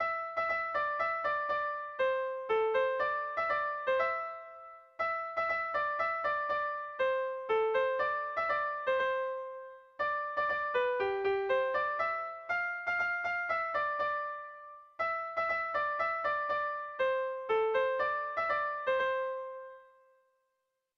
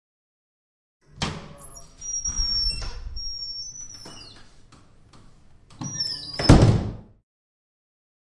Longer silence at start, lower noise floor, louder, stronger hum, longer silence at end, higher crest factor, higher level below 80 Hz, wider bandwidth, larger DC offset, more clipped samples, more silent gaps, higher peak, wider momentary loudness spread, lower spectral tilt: second, 0 s vs 1.15 s; first, -83 dBFS vs -51 dBFS; second, -32 LUFS vs -23 LUFS; neither; about the same, 1.15 s vs 1.2 s; second, 14 dB vs 24 dB; second, -70 dBFS vs -34 dBFS; second, 6.6 kHz vs 11.5 kHz; neither; neither; neither; second, -18 dBFS vs -2 dBFS; second, 7 LU vs 26 LU; about the same, -4.5 dB/octave vs -4.5 dB/octave